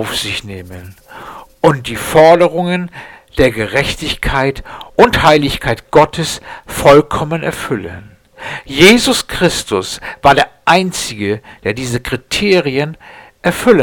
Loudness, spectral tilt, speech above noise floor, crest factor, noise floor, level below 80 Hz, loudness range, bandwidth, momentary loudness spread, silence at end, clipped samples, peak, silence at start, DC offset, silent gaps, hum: -13 LUFS; -4.5 dB/octave; 20 dB; 14 dB; -33 dBFS; -34 dBFS; 2 LU; 19.5 kHz; 18 LU; 0 s; 0.2%; 0 dBFS; 0 s; under 0.1%; none; none